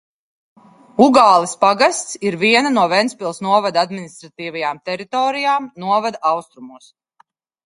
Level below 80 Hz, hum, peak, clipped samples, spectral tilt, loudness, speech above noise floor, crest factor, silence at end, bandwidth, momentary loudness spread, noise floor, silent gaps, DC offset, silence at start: -66 dBFS; none; 0 dBFS; under 0.1%; -3.5 dB/octave; -16 LUFS; 41 dB; 18 dB; 0.9 s; 11.5 kHz; 12 LU; -57 dBFS; none; under 0.1%; 1 s